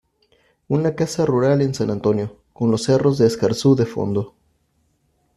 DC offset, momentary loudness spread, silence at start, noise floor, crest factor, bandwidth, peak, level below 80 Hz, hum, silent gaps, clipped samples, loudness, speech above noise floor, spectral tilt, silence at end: under 0.1%; 7 LU; 0.7 s; -65 dBFS; 16 dB; 13 kHz; -4 dBFS; -54 dBFS; none; none; under 0.1%; -19 LUFS; 47 dB; -7 dB/octave; 1.05 s